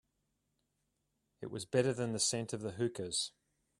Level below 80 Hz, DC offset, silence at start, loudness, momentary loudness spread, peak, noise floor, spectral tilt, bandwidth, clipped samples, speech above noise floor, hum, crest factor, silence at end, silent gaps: -74 dBFS; under 0.1%; 1.4 s; -36 LUFS; 11 LU; -16 dBFS; -83 dBFS; -3.5 dB/octave; 14 kHz; under 0.1%; 47 dB; none; 22 dB; 0.5 s; none